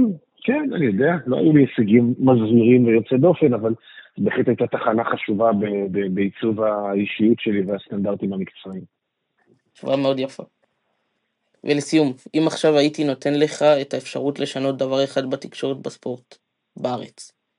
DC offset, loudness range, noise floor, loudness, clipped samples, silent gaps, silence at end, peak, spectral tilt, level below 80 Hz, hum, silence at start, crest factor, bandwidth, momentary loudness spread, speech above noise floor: under 0.1%; 9 LU; -73 dBFS; -20 LUFS; under 0.1%; none; 0.3 s; -2 dBFS; -6.5 dB/octave; -70 dBFS; none; 0 s; 18 dB; 11 kHz; 14 LU; 53 dB